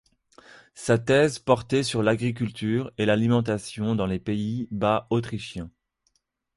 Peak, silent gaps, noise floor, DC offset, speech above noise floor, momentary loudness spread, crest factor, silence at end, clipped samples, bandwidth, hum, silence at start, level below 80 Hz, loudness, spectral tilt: -6 dBFS; none; -72 dBFS; under 0.1%; 48 dB; 12 LU; 20 dB; 0.9 s; under 0.1%; 11.5 kHz; none; 0.75 s; -54 dBFS; -25 LUFS; -6 dB/octave